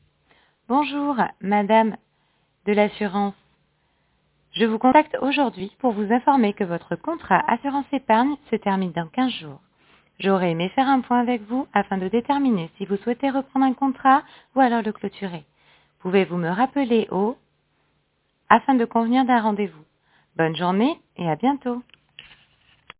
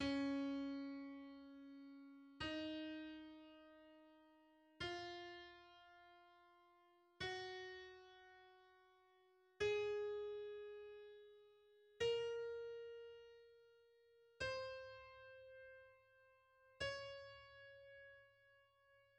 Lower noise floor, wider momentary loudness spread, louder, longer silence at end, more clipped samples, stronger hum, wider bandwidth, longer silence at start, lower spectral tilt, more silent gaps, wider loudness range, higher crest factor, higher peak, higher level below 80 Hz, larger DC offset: second, -69 dBFS vs -75 dBFS; second, 10 LU vs 23 LU; first, -22 LUFS vs -48 LUFS; first, 0.8 s vs 0.15 s; neither; neither; second, 4 kHz vs 9.6 kHz; first, 0.7 s vs 0 s; first, -10 dB/octave vs -4.5 dB/octave; neither; second, 3 LU vs 7 LU; about the same, 22 dB vs 20 dB; first, 0 dBFS vs -32 dBFS; first, -62 dBFS vs -76 dBFS; neither